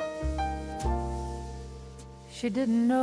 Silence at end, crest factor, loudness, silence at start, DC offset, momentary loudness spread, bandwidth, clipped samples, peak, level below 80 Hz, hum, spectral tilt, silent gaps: 0 s; 14 dB; -31 LUFS; 0 s; under 0.1%; 18 LU; 11 kHz; under 0.1%; -16 dBFS; -38 dBFS; none; -6.5 dB/octave; none